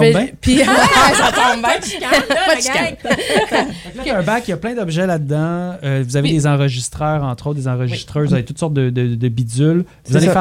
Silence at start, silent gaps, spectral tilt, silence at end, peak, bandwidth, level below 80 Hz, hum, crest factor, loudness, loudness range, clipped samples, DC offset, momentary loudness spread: 0 s; none; -5 dB/octave; 0 s; 0 dBFS; 16.5 kHz; -40 dBFS; none; 14 dB; -16 LUFS; 5 LU; under 0.1%; under 0.1%; 10 LU